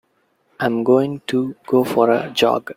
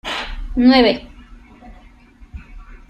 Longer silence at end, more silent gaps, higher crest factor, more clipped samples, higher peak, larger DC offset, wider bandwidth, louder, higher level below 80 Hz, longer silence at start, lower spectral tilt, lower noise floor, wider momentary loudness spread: about the same, 0.05 s vs 0.15 s; neither; about the same, 16 dB vs 18 dB; neither; about the same, -2 dBFS vs -2 dBFS; neither; first, 16.5 kHz vs 8.8 kHz; second, -18 LUFS vs -15 LUFS; second, -62 dBFS vs -34 dBFS; first, 0.6 s vs 0.05 s; about the same, -5.5 dB/octave vs -5.5 dB/octave; first, -64 dBFS vs -45 dBFS; second, 6 LU vs 26 LU